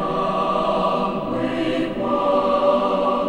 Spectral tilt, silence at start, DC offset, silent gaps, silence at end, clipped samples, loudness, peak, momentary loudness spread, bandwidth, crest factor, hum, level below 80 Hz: -7 dB/octave; 0 s; under 0.1%; none; 0 s; under 0.1%; -20 LUFS; -6 dBFS; 5 LU; 10 kHz; 14 dB; none; -46 dBFS